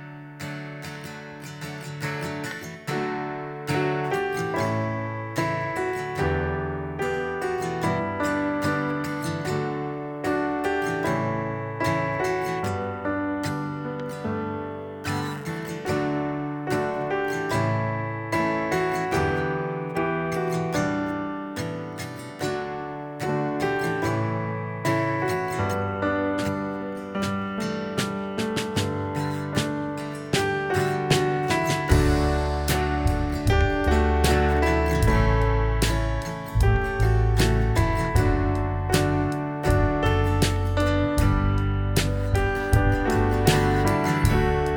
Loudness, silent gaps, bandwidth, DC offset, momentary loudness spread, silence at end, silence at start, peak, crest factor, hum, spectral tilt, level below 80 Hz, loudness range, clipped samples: -25 LUFS; none; over 20 kHz; under 0.1%; 10 LU; 0 s; 0 s; -2 dBFS; 22 dB; none; -6 dB/octave; -32 dBFS; 6 LU; under 0.1%